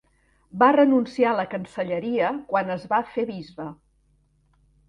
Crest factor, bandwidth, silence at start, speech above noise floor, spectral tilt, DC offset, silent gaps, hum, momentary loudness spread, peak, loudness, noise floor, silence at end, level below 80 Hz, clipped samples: 20 dB; 9.4 kHz; 0.55 s; 41 dB; -7.5 dB/octave; under 0.1%; none; none; 18 LU; -4 dBFS; -23 LUFS; -64 dBFS; 1.15 s; -64 dBFS; under 0.1%